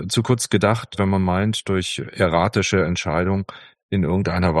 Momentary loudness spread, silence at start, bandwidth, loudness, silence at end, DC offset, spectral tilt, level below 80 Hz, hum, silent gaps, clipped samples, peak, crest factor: 5 LU; 0 s; 12.5 kHz; -20 LUFS; 0 s; under 0.1%; -5.5 dB/octave; -44 dBFS; none; 3.83-3.89 s; under 0.1%; -2 dBFS; 18 dB